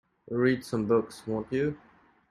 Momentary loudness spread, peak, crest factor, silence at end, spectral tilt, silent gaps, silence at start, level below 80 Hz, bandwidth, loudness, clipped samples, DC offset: 8 LU; -12 dBFS; 18 dB; 0.55 s; -7 dB/octave; none; 0.3 s; -62 dBFS; 13 kHz; -29 LUFS; under 0.1%; under 0.1%